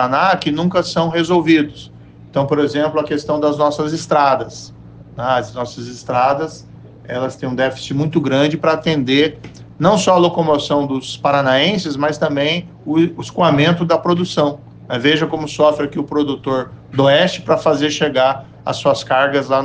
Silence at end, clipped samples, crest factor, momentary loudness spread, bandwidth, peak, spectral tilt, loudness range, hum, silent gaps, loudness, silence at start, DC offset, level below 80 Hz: 0 s; under 0.1%; 14 dB; 11 LU; 9.6 kHz; -2 dBFS; -5.5 dB/octave; 4 LU; none; none; -16 LUFS; 0 s; under 0.1%; -50 dBFS